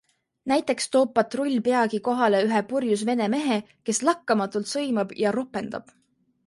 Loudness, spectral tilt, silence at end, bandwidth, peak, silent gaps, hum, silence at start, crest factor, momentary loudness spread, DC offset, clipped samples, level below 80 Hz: -24 LUFS; -4 dB/octave; 0.65 s; 11.5 kHz; -8 dBFS; none; none; 0.45 s; 18 dB; 7 LU; under 0.1%; under 0.1%; -70 dBFS